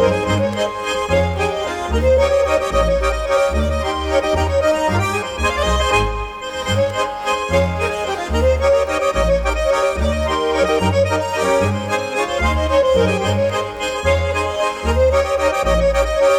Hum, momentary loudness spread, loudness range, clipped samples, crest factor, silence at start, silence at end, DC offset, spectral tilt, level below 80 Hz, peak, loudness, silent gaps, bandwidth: none; 5 LU; 1 LU; under 0.1%; 14 dB; 0 s; 0 s; under 0.1%; -5 dB/octave; -26 dBFS; -4 dBFS; -17 LUFS; none; 15.5 kHz